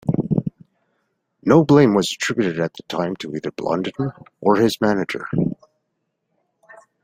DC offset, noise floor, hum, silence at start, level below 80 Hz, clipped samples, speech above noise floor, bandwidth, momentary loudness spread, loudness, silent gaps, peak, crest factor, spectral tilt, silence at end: under 0.1%; -74 dBFS; none; 0.05 s; -54 dBFS; under 0.1%; 56 dB; 16 kHz; 14 LU; -20 LUFS; none; -2 dBFS; 18 dB; -6 dB/octave; 1.5 s